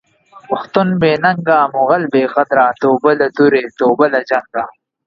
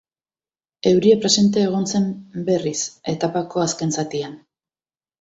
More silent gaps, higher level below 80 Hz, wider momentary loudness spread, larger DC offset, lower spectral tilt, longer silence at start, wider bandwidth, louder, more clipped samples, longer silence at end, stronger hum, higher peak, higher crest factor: neither; about the same, -56 dBFS vs -60 dBFS; second, 8 LU vs 11 LU; neither; first, -8 dB/octave vs -4.5 dB/octave; second, 0.5 s vs 0.85 s; second, 6.8 kHz vs 8 kHz; first, -14 LUFS vs -20 LUFS; neither; second, 0.35 s vs 0.85 s; neither; about the same, 0 dBFS vs -2 dBFS; about the same, 14 dB vs 18 dB